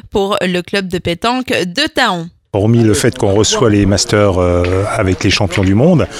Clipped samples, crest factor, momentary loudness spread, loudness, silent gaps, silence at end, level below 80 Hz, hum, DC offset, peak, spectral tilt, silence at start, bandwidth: under 0.1%; 12 dB; 6 LU; -13 LUFS; none; 0 s; -34 dBFS; none; under 0.1%; 0 dBFS; -5 dB/octave; 0.05 s; 15.5 kHz